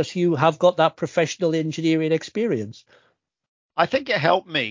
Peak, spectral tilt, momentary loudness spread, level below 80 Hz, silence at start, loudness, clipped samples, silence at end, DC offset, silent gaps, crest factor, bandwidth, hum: -2 dBFS; -5.5 dB/octave; 6 LU; -66 dBFS; 0 s; -21 LUFS; under 0.1%; 0 s; under 0.1%; 3.48-3.69 s; 20 dB; 7.6 kHz; none